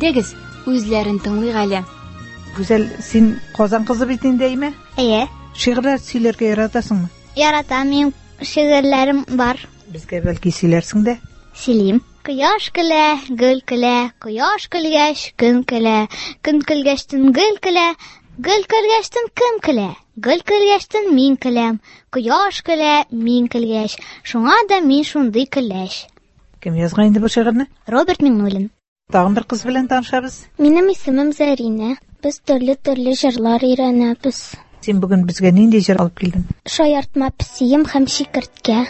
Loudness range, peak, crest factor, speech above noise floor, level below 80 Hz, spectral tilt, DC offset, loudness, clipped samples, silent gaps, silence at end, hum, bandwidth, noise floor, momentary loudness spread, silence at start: 2 LU; 0 dBFS; 16 dB; 34 dB; -42 dBFS; -5.5 dB/octave; under 0.1%; -16 LUFS; under 0.1%; 28.88-28.96 s; 0 s; none; 8.4 kHz; -50 dBFS; 10 LU; 0 s